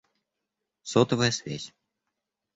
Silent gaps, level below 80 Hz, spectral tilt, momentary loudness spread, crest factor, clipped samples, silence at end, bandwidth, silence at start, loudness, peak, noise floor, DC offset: none; -62 dBFS; -4.5 dB/octave; 19 LU; 24 dB; under 0.1%; 0.9 s; 8 kHz; 0.85 s; -25 LUFS; -8 dBFS; -85 dBFS; under 0.1%